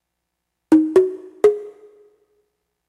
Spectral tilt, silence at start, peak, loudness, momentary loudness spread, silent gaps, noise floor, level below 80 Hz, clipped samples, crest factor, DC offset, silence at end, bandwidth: -6.5 dB/octave; 0.7 s; -2 dBFS; -17 LUFS; 9 LU; none; -78 dBFS; -62 dBFS; under 0.1%; 18 dB; under 0.1%; 1.2 s; 11.5 kHz